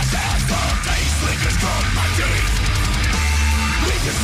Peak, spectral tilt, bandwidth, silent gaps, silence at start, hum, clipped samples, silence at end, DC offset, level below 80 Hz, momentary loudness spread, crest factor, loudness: -8 dBFS; -3.5 dB/octave; 16 kHz; none; 0 s; none; under 0.1%; 0 s; under 0.1%; -22 dBFS; 1 LU; 10 dB; -19 LUFS